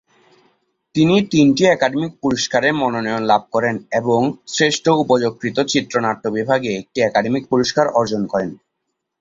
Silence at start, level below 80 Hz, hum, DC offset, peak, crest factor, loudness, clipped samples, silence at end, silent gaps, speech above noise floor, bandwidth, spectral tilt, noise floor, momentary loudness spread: 0.95 s; -54 dBFS; none; under 0.1%; -2 dBFS; 16 dB; -17 LUFS; under 0.1%; 0.65 s; none; 59 dB; 7.8 kHz; -5 dB/octave; -76 dBFS; 7 LU